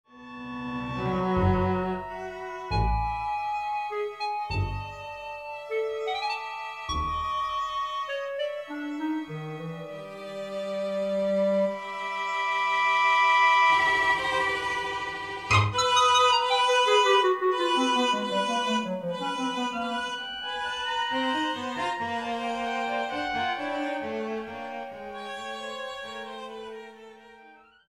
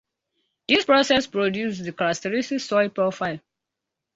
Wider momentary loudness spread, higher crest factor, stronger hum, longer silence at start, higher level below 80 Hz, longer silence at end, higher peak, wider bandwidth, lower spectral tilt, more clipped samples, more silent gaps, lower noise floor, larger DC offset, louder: first, 16 LU vs 12 LU; about the same, 18 dB vs 20 dB; first, 50 Hz at -60 dBFS vs none; second, 0.15 s vs 0.7 s; first, -46 dBFS vs -62 dBFS; second, 0.35 s vs 0.8 s; second, -10 dBFS vs -4 dBFS; first, 13.5 kHz vs 8 kHz; about the same, -4 dB/octave vs -4 dB/octave; neither; neither; second, -54 dBFS vs -84 dBFS; neither; second, -27 LUFS vs -22 LUFS